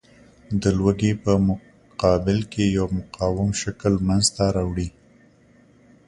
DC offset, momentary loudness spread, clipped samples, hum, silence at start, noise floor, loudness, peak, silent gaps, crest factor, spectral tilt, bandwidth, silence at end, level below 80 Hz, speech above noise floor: under 0.1%; 8 LU; under 0.1%; none; 0.5 s; -54 dBFS; -22 LUFS; -4 dBFS; none; 18 dB; -5.5 dB/octave; 11.5 kHz; 1.2 s; -38 dBFS; 33 dB